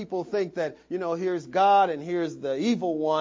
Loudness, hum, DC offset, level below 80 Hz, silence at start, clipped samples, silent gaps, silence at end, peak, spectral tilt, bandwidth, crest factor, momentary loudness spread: -26 LUFS; none; under 0.1%; -70 dBFS; 0 s; under 0.1%; none; 0 s; -10 dBFS; -6 dB/octave; 7.6 kHz; 14 dB; 10 LU